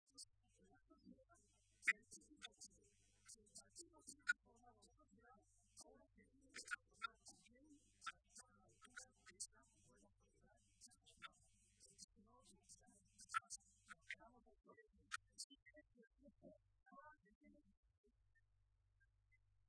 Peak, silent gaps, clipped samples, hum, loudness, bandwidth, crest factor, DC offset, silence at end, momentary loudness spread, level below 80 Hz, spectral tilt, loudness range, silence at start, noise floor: -24 dBFS; 12.04-12.08 s, 15.44-15.50 s, 17.35-17.41 s; under 0.1%; none; -52 LUFS; 11 kHz; 34 dB; under 0.1%; 2.1 s; 21 LU; -84 dBFS; -0.5 dB/octave; 11 LU; 0.15 s; -82 dBFS